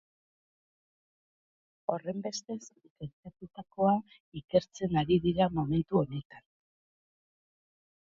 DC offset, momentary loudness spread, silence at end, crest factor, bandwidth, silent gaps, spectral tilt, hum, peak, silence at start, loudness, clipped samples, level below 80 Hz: under 0.1%; 19 LU; 1.8 s; 22 dB; 7.6 kHz; 2.90-2.96 s, 3.13-3.23 s, 4.20-4.32 s, 4.44-4.48 s, 6.25-6.30 s; -7 dB/octave; none; -12 dBFS; 1.9 s; -31 LUFS; under 0.1%; -60 dBFS